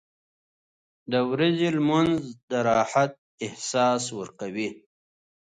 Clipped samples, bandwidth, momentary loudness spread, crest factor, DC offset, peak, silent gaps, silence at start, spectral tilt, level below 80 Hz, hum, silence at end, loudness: under 0.1%; 9.6 kHz; 12 LU; 16 dB; under 0.1%; -10 dBFS; 2.43-2.48 s, 3.18-3.38 s; 1.1 s; -5 dB/octave; -64 dBFS; none; 0.65 s; -25 LUFS